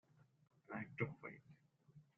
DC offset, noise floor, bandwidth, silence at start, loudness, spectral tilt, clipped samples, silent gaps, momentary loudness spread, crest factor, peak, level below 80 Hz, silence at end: under 0.1%; -69 dBFS; 6.8 kHz; 0.15 s; -49 LUFS; -7 dB/octave; under 0.1%; none; 23 LU; 26 dB; -28 dBFS; -82 dBFS; 0.15 s